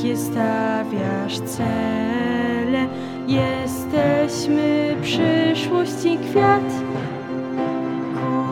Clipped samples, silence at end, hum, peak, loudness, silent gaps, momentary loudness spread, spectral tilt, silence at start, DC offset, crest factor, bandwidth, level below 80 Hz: under 0.1%; 0 s; none; -4 dBFS; -21 LUFS; none; 7 LU; -6 dB/octave; 0 s; under 0.1%; 16 dB; 17 kHz; -52 dBFS